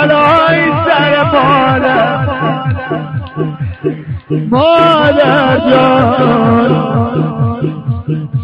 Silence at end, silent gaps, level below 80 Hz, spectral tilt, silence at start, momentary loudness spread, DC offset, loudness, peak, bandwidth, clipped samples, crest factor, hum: 0 s; none; -38 dBFS; -8.5 dB/octave; 0 s; 11 LU; under 0.1%; -11 LUFS; 0 dBFS; 5.4 kHz; under 0.1%; 10 dB; none